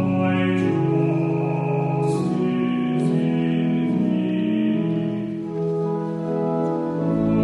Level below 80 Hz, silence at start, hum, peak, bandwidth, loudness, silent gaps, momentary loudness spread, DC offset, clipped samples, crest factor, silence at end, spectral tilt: -54 dBFS; 0 s; none; -10 dBFS; 11 kHz; -22 LUFS; none; 5 LU; under 0.1%; under 0.1%; 12 dB; 0 s; -9 dB/octave